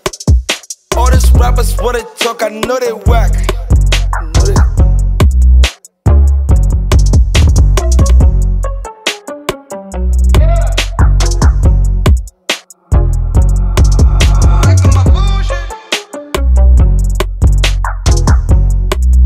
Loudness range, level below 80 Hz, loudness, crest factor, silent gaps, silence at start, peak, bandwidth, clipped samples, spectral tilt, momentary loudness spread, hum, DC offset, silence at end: 3 LU; -10 dBFS; -11 LUFS; 8 dB; none; 0.05 s; 0 dBFS; 15 kHz; under 0.1%; -5.5 dB/octave; 9 LU; none; under 0.1%; 0 s